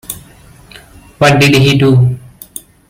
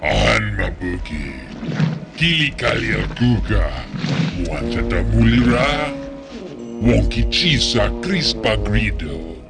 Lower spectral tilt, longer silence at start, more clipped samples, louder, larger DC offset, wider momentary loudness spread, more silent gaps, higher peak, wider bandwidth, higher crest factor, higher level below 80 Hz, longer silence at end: about the same, -5.5 dB/octave vs -5.5 dB/octave; about the same, 0.1 s vs 0 s; neither; first, -9 LUFS vs -18 LUFS; neither; first, 21 LU vs 13 LU; neither; about the same, 0 dBFS vs -2 dBFS; first, 17.5 kHz vs 10 kHz; about the same, 12 dB vs 16 dB; second, -40 dBFS vs -26 dBFS; first, 0.7 s vs 0 s